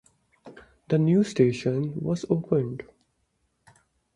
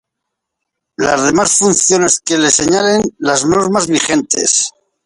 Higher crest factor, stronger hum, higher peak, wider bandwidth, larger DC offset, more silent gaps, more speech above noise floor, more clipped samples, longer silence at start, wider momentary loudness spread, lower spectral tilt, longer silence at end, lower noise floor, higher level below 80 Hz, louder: first, 20 dB vs 14 dB; neither; second, -8 dBFS vs 0 dBFS; about the same, 11 kHz vs 11.5 kHz; neither; neither; second, 49 dB vs 64 dB; neither; second, 0.45 s vs 1 s; first, 8 LU vs 5 LU; first, -8 dB/octave vs -2.5 dB/octave; first, 1.35 s vs 0.35 s; about the same, -73 dBFS vs -76 dBFS; second, -60 dBFS vs -48 dBFS; second, -25 LUFS vs -12 LUFS